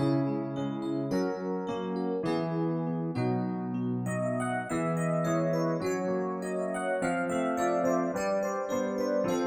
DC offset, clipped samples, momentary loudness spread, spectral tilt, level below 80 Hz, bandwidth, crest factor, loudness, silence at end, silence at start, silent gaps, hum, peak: under 0.1%; under 0.1%; 5 LU; -7 dB/octave; -64 dBFS; 17 kHz; 14 dB; -31 LUFS; 0 s; 0 s; none; none; -16 dBFS